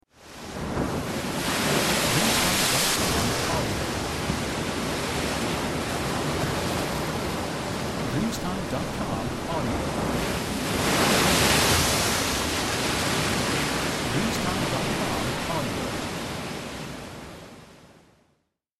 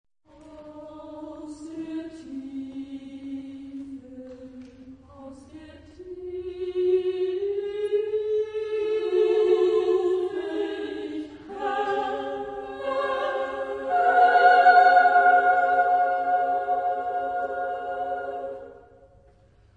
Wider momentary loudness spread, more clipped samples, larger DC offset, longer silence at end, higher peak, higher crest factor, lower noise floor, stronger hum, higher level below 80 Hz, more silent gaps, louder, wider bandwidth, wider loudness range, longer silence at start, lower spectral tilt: second, 11 LU vs 24 LU; neither; neither; about the same, 0.9 s vs 1 s; second, -8 dBFS vs -4 dBFS; about the same, 20 dB vs 20 dB; first, -72 dBFS vs -57 dBFS; neither; first, -42 dBFS vs -62 dBFS; neither; about the same, -25 LUFS vs -23 LUFS; first, 16 kHz vs 9 kHz; second, 6 LU vs 20 LU; second, 0.2 s vs 0.45 s; second, -3.5 dB/octave vs -5 dB/octave